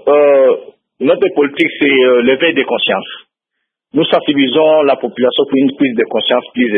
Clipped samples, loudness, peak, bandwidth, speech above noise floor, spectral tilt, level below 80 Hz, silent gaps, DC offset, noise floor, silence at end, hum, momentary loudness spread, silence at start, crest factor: under 0.1%; -12 LUFS; 0 dBFS; 4.5 kHz; 63 dB; -7 dB/octave; -62 dBFS; none; under 0.1%; -74 dBFS; 0 s; none; 7 LU; 0.05 s; 12 dB